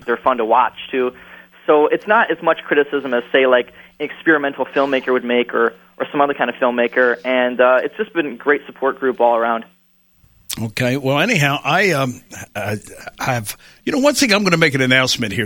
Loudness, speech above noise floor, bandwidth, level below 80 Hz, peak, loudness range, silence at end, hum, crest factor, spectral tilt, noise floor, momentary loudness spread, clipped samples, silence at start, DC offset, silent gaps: -17 LUFS; 39 dB; 19 kHz; -56 dBFS; 0 dBFS; 2 LU; 0 s; none; 18 dB; -4.5 dB/octave; -56 dBFS; 11 LU; under 0.1%; 0.05 s; under 0.1%; none